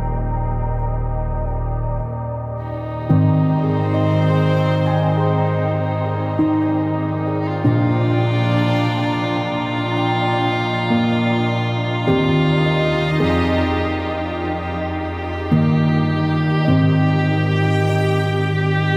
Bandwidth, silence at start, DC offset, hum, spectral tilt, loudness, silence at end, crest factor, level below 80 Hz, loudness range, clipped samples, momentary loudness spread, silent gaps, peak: 8.2 kHz; 0 s; under 0.1%; none; -8 dB/octave; -19 LUFS; 0 s; 12 dB; -32 dBFS; 2 LU; under 0.1%; 7 LU; none; -4 dBFS